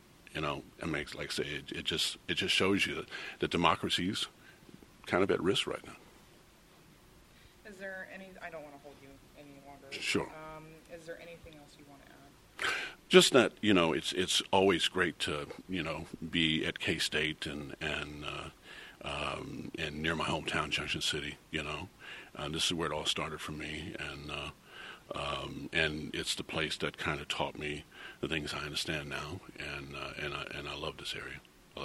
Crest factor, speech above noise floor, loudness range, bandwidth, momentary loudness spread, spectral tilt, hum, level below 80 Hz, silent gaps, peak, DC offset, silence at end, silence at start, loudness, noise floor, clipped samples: 28 dB; 26 dB; 13 LU; 15.5 kHz; 19 LU; -3.5 dB/octave; none; -58 dBFS; none; -6 dBFS; under 0.1%; 0 s; 0.3 s; -33 LUFS; -60 dBFS; under 0.1%